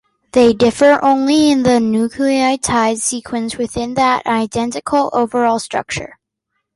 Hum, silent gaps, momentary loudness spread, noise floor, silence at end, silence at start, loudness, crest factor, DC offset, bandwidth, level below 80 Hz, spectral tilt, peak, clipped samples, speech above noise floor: none; none; 10 LU; -73 dBFS; 0.7 s; 0.35 s; -15 LUFS; 14 dB; under 0.1%; 11.5 kHz; -46 dBFS; -4 dB/octave; -2 dBFS; under 0.1%; 59 dB